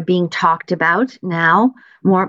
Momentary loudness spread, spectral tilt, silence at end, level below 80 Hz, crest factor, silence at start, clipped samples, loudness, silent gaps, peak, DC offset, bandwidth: 6 LU; -7 dB/octave; 0 s; -66 dBFS; 14 dB; 0 s; under 0.1%; -16 LUFS; none; -2 dBFS; under 0.1%; 7.6 kHz